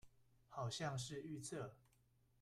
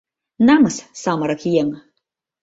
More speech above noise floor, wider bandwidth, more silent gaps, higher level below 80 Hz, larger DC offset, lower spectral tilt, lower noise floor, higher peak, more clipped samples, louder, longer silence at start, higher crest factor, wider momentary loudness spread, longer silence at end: second, 29 dB vs 60 dB; first, 14 kHz vs 8 kHz; neither; second, -76 dBFS vs -58 dBFS; neither; about the same, -4.5 dB/octave vs -5.5 dB/octave; about the same, -77 dBFS vs -76 dBFS; second, -32 dBFS vs -2 dBFS; neither; second, -48 LUFS vs -18 LUFS; second, 0.05 s vs 0.4 s; about the same, 18 dB vs 18 dB; second, 9 LU vs 12 LU; about the same, 0.65 s vs 0.65 s